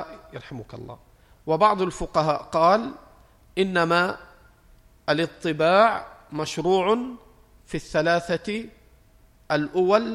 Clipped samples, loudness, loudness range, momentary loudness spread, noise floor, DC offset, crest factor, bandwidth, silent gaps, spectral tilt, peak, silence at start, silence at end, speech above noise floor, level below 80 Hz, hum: under 0.1%; -23 LUFS; 3 LU; 19 LU; -56 dBFS; under 0.1%; 20 dB; 13.5 kHz; none; -5.5 dB/octave; -4 dBFS; 0 s; 0 s; 33 dB; -52 dBFS; none